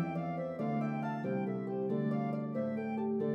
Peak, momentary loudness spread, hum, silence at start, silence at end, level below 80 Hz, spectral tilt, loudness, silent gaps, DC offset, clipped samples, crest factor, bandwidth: -24 dBFS; 3 LU; none; 0 s; 0 s; -76 dBFS; -10 dB/octave; -36 LUFS; none; under 0.1%; under 0.1%; 12 dB; 6 kHz